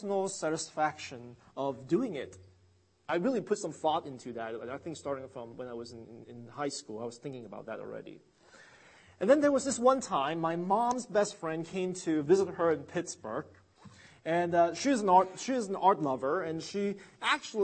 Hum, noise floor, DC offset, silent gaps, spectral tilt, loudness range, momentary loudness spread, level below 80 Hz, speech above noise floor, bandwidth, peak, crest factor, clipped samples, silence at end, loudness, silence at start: none; -67 dBFS; under 0.1%; none; -4.5 dB/octave; 12 LU; 17 LU; -74 dBFS; 35 dB; 8.8 kHz; -10 dBFS; 22 dB; under 0.1%; 0 s; -31 LUFS; 0 s